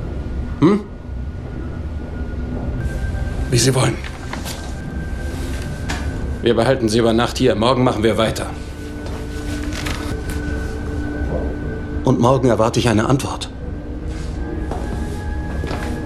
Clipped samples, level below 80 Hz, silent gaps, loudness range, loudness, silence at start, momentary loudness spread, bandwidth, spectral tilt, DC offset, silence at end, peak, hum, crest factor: under 0.1%; -28 dBFS; none; 5 LU; -20 LUFS; 0 s; 13 LU; 14 kHz; -5.5 dB/octave; under 0.1%; 0 s; -2 dBFS; none; 18 dB